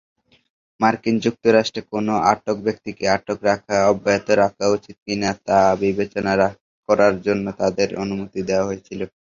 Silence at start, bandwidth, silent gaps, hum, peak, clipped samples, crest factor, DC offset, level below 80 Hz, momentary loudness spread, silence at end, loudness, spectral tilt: 0.8 s; 7.6 kHz; 5.02-5.06 s, 6.61-6.83 s; none; -2 dBFS; under 0.1%; 18 dB; under 0.1%; -52 dBFS; 9 LU; 0.3 s; -20 LUFS; -5 dB/octave